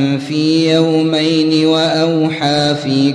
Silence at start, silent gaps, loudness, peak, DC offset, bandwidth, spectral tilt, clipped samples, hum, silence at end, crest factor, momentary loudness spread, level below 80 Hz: 0 s; none; -13 LUFS; 0 dBFS; under 0.1%; 10.5 kHz; -5.5 dB/octave; under 0.1%; none; 0 s; 12 dB; 3 LU; -54 dBFS